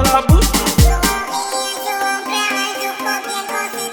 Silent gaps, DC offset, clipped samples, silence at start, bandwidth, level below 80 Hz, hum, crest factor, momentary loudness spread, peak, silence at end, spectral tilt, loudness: none; under 0.1%; under 0.1%; 0 s; 19.5 kHz; -22 dBFS; none; 16 dB; 8 LU; 0 dBFS; 0 s; -3.5 dB/octave; -17 LUFS